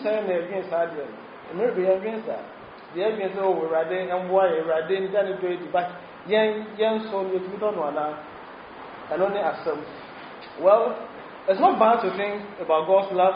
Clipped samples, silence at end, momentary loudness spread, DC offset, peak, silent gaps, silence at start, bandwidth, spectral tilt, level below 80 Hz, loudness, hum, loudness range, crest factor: under 0.1%; 0 s; 20 LU; under 0.1%; -6 dBFS; none; 0 s; 5.2 kHz; -3.5 dB/octave; -68 dBFS; -24 LUFS; none; 4 LU; 18 dB